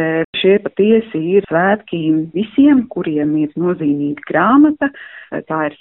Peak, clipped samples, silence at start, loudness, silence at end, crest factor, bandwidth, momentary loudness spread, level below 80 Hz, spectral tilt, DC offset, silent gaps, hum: -2 dBFS; under 0.1%; 0 s; -15 LUFS; 0.1 s; 14 dB; 4 kHz; 9 LU; -54 dBFS; -5 dB/octave; under 0.1%; 0.24-0.33 s; none